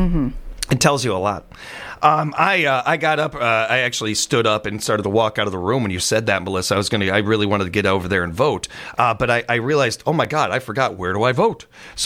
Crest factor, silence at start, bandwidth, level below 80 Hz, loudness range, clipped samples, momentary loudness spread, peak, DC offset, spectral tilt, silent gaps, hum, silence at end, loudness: 18 dB; 0 s; 16.5 kHz; -38 dBFS; 1 LU; under 0.1%; 6 LU; 0 dBFS; under 0.1%; -4 dB/octave; none; none; 0 s; -19 LUFS